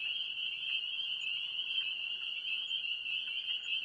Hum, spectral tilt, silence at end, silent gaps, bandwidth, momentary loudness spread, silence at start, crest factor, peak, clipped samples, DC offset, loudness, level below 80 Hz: none; 1.5 dB/octave; 0 s; none; 11 kHz; 2 LU; 0 s; 14 dB; -24 dBFS; under 0.1%; under 0.1%; -35 LUFS; -82 dBFS